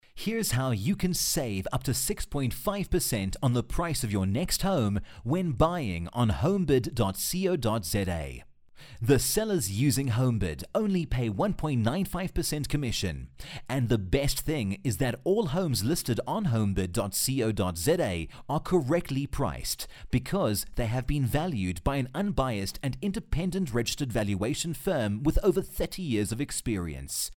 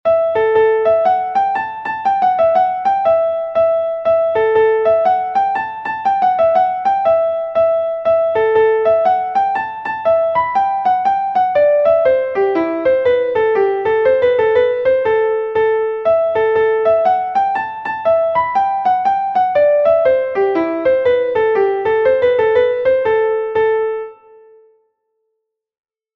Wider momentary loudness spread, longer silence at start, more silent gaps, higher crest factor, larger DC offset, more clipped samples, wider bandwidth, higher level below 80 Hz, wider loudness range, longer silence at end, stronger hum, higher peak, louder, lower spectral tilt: about the same, 6 LU vs 4 LU; about the same, 0.15 s vs 0.05 s; neither; first, 18 dB vs 12 dB; neither; neither; first, 18 kHz vs 6 kHz; first, -40 dBFS vs -52 dBFS; about the same, 2 LU vs 1 LU; second, 0.05 s vs 2.05 s; neither; second, -10 dBFS vs -2 dBFS; second, -29 LUFS vs -15 LUFS; second, -5 dB/octave vs -6.5 dB/octave